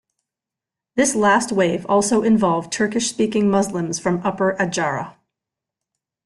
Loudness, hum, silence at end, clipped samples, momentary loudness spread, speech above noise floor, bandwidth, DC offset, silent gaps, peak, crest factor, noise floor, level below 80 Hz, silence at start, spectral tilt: -19 LUFS; none; 1.15 s; under 0.1%; 6 LU; 68 dB; 12 kHz; under 0.1%; none; -4 dBFS; 16 dB; -87 dBFS; -58 dBFS; 0.95 s; -4.5 dB/octave